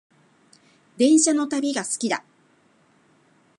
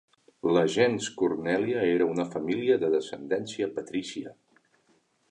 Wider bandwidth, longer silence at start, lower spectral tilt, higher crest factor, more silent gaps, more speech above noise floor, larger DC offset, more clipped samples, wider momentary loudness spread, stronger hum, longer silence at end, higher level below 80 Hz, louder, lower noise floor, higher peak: about the same, 11.5 kHz vs 10.5 kHz; first, 1 s vs 0.45 s; second, -2.5 dB/octave vs -5 dB/octave; about the same, 18 dB vs 18 dB; neither; about the same, 40 dB vs 41 dB; neither; neither; about the same, 9 LU vs 9 LU; neither; first, 1.4 s vs 1 s; second, -78 dBFS vs -68 dBFS; first, -21 LUFS vs -27 LUFS; second, -60 dBFS vs -68 dBFS; first, -6 dBFS vs -10 dBFS